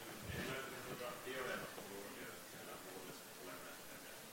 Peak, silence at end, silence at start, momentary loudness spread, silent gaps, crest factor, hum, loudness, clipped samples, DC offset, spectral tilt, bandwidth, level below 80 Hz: -32 dBFS; 0 s; 0 s; 8 LU; none; 18 dB; none; -49 LUFS; under 0.1%; under 0.1%; -3 dB/octave; 16.5 kHz; -72 dBFS